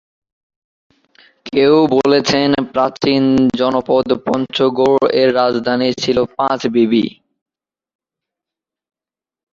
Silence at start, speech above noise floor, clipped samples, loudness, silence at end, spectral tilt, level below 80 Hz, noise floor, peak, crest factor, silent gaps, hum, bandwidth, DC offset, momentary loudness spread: 1.45 s; over 76 dB; under 0.1%; -14 LUFS; 2.45 s; -5.5 dB/octave; -52 dBFS; under -90 dBFS; 0 dBFS; 16 dB; none; none; 7.6 kHz; under 0.1%; 5 LU